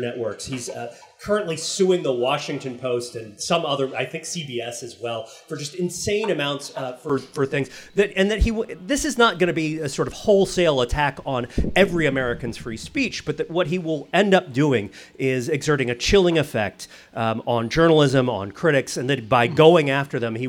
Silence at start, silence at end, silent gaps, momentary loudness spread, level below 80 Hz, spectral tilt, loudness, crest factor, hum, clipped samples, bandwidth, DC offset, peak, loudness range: 0 s; 0 s; none; 13 LU; -38 dBFS; -5 dB/octave; -22 LUFS; 20 dB; none; under 0.1%; 17 kHz; under 0.1%; 0 dBFS; 6 LU